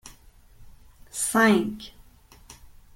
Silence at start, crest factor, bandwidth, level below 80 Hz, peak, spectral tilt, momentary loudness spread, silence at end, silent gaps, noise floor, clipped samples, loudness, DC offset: 0.05 s; 22 dB; 16.5 kHz; -54 dBFS; -6 dBFS; -4 dB/octave; 21 LU; 0.3 s; none; -52 dBFS; under 0.1%; -22 LUFS; under 0.1%